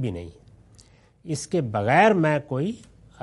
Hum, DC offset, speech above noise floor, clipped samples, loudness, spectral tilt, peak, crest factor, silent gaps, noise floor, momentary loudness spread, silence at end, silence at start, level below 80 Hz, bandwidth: none; under 0.1%; 32 dB; under 0.1%; -23 LUFS; -6 dB/octave; -2 dBFS; 22 dB; none; -54 dBFS; 20 LU; 0.45 s; 0 s; -58 dBFS; 11.5 kHz